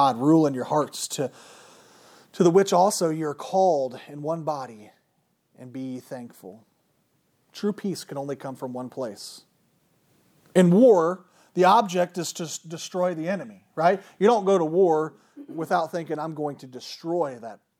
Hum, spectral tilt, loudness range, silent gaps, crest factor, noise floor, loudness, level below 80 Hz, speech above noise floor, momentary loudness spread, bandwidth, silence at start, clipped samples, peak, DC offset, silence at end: none; -5.5 dB/octave; 13 LU; none; 18 dB; -70 dBFS; -24 LUFS; -82 dBFS; 47 dB; 18 LU; 16 kHz; 0 s; under 0.1%; -6 dBFS; under 0.1%; 0.25 s